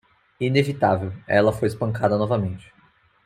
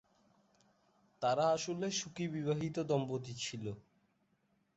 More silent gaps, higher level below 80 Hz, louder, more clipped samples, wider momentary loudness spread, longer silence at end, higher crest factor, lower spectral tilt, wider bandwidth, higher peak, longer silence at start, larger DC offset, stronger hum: neither; first, -54 dBFS vs -74 dBFS; first, -22 LUFS vs -37 LUFS; neither; about the same, 8 LU vs 10 LU; second, 0.65 s vs 0.95 s; about the same, 20 dB vs 18 dB; first, -7 dB/octave vs -5 dB/octave; first, 14.5 kHz vs 8 kHz; first, -4 dBFS vs -20 dBFS; second, 0.4 s vs 1.2 s; neither; neither